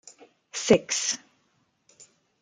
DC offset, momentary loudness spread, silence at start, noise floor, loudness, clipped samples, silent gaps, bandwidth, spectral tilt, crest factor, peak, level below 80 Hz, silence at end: under 0.1%; 13 LU; 0.55 s; -70 dBFS; -25 LUFS; under 0.1%; none; 11 kHz; -3 dB/octave; 26 dB; -4 dBFS; -64 dBFS; 1.25 s